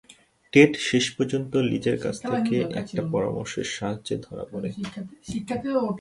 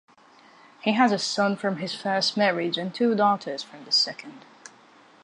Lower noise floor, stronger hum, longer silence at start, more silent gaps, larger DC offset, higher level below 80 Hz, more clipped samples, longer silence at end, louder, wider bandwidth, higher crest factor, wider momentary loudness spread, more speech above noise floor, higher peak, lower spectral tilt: second, -47 dBFS vs -54 dBFS; neither; second, 0.1 s vs 0.85 s; neither; neither; first, -56 dBFS vs -78 dBFS; neither; second, 0 s vs 0.85 s; about the same, -25 LUFS vs -24 LUFS; about the same, 11.5 kHz vs 11 kHz; about the same, 22 dB vs 20 dB; first, 15 LU vs 10 LU; second, 23 dB vs 30 dB; about the same, -4 dBFS vs -6 dBFS; about the same, -5 dB/octave vs -4 dB/octave